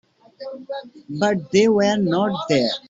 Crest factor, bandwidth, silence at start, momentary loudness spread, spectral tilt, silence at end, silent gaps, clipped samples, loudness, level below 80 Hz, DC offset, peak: 18 dB; 7.8 kHz; 0.4 s; 18 LU; -5.5 dB/octave; 0.1 s; none; under 0.1%; -19 LUFS; -62 dBFS; under 0.1%; -4 dBFS